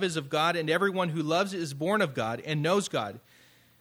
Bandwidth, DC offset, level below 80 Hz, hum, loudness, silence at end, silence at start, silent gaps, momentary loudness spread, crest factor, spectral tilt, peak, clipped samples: 16.5 kHz; under 0.1%; -72 dBFS; none; -28 LUFS; 0.6 s; 0 s; none; 6 LU; 16 dB; -5 dB/octave; -12 dBFS; under 0.1%